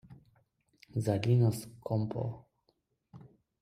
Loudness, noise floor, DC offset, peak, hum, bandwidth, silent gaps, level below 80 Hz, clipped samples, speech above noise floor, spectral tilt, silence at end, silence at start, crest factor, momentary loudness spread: -32 LUFS; -76 dBFS; under 0.1%; -16 dBFS; none; 14.5 kHz; none; -66 dBFS; under 0.1%; 46 dB; -7.5 dB/octave; 0.35 s; 0.1 s; 18 dB; 13 LU